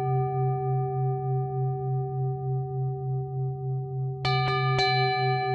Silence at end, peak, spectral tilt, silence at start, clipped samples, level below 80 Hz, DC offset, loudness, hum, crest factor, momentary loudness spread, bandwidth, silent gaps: 0 s; -12 dBFS; -7 dB/octave; 0 s; under 0.1%; -58 dBFS; under 0.1%; -28 LUFS; none; 14 dB; 8 LU; 6.8 kHz; none